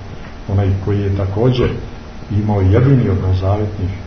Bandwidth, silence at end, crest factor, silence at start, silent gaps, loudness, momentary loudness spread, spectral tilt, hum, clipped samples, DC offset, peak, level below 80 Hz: 6.2 kHz; 0 s; 14 dB; 0 s; none; -16 LUFS; 16 LU; -9 dB/octave; none; under 0.1%; 0.9%; 0 dBFS; -32 dBFS